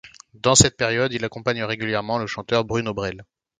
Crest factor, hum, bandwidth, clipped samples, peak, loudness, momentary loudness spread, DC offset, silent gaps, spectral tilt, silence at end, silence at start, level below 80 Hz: 22 dB; none; 15 kHz; under 0.1%; 0 dBFS; -21 LUFS; 12 LU; under 0.1%; none; -3 dB/octave; 0.35 s; 0.05 s; -46 dBFS